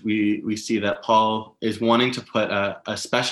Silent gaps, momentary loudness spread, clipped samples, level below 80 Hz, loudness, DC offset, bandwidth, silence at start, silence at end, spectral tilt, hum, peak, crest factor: none; 7 LU; under 0.1%; -66 dBFS; -22 LUFS; under 0.1%; 12.5 kHz; 0.05 s; 0 s; -4.5 dB/octave; none; -4 dBFS; 18 dB